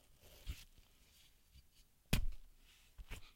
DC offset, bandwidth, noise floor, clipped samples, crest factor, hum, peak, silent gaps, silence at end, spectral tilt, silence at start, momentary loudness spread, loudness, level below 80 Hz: under 0.1%; 16.5 kHz; -69 dBFS; under 0.1%; 26 dB; none; -20 dBFS; none; 0.1 s; -4 dB/octave; 0.25 s; 26 LU; -46 LUFS; -50 dBFS